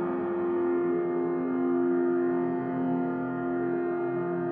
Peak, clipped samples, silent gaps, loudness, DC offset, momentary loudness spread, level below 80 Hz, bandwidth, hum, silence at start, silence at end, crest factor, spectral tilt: -18 dBFS; under 0.1%; none; -28 LUFS; under 0.1%; 4 LU; -72 dBFS; 3.4 kHz; none; 0 s; 0 s; 10 dB; -8.5 dB/octave